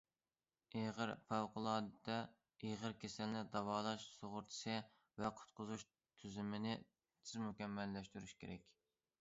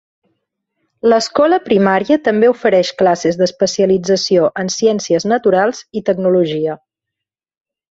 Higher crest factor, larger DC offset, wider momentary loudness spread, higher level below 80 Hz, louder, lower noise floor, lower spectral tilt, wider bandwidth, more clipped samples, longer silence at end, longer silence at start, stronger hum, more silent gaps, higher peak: first, 22 dB vs 14 dB; neither; first, 12 LU vs 6 LU; second, -76 dBFS vs -56 dBFS; second, -47 LUFS vs -14 LUFS; first, under -90 dBFS vs -82 dBFS; about the same, -4.5 dB/octave vs -5 dB/octave; about the same, 7.6 kHz vs 8 kHz; neither; second, 0.5 s vs 1.15 s; second, 0.75 s vs 1.05 s; neither; neither; second, -26 dBFS vs -2 dBFS